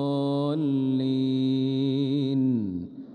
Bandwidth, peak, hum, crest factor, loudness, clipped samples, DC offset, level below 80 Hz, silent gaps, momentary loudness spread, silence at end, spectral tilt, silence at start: 4.7 kHz; -16 dBFS; none; 10 dB; -26 LUFS; under 0.1%; under 0.1%; -68 dBFS; none; 2 LU; 0 s; -9.5 dB/octave; 0 s